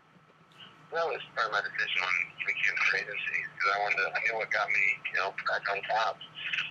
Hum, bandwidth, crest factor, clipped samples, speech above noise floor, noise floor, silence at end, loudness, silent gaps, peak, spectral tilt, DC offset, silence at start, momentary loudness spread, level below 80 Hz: none; 9.4 kHz; 18 dB; under 0.1%; 29 dB; -60 dBFS; 0 s; -29 LUFS; none; -14 dBFS; -1.5 dB/octave; under 0.1%; 0.6 s; 7 LU; -80 dBFS